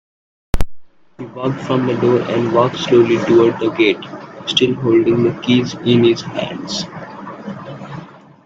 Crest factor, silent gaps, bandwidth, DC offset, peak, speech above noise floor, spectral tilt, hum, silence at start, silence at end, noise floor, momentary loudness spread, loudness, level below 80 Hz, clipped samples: 16 dB; none; 7.8 kHz; under 0.1%; 0 dBFS; 21 dB; -6 dB/octave; none; 0.55 s; 0.35 s; -36 dBFS; 18 LU; -16 LUFS; -34 dBFS; under 0.1%